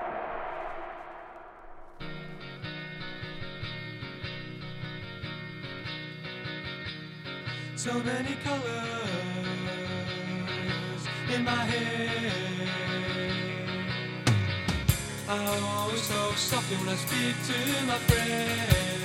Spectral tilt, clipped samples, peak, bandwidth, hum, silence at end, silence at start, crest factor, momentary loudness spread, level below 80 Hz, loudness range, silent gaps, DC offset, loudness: -4 dB/octave; under 0.1%; -8 dBFS; 16 kHz; none; 0 s; 0 s; 24 dB; 12 LU; -48 dBFS; 11 LU; none; under 0.1%; -31 LUFS